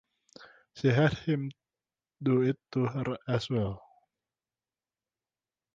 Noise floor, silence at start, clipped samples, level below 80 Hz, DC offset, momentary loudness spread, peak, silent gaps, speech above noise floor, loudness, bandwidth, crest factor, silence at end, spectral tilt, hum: under -90 dBFS; 0.4 s; under 0.1%; -60 dBFS; under 0.1%; 11 LU; -12 dBFS; none; over 61 dB; -30 LUFS; 7.6 kHz; 20 dB; 1.95 s; -7.5 dB/octave; none